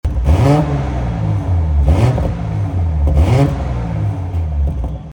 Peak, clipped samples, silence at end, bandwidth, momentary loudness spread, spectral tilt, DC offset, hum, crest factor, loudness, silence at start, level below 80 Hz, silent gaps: 0 dBFS; under 0.1%; 0 s; 10 kHz; 7 LU; -8.5 dB/octave; under 0.1%; none; 14 dB; -16 LUFS; 0.05 s; -20 dBFS; none